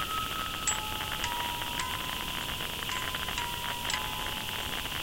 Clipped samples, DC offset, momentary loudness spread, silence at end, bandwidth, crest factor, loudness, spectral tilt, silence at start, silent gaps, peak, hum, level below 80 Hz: under 0.1%; under 0.1%; 3 LU; 0 s; 16 kHz; 18 dB; -32 LUFS; -1.5 dB/octave; 0 s; none; -16 dBFS; none; -48 dBFS